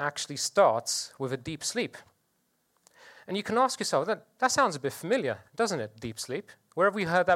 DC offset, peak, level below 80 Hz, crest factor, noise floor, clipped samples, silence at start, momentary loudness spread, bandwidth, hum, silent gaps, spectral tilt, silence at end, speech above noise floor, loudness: under 0.1%; -10 dBFS; -68 dBFS; 20 dB; -74 dBFS; under 0.1%; 0 s; 12 LU; 16.5 kHz; none; none; -3 dB/octave; 0 s; 45 dB; -29 LUFS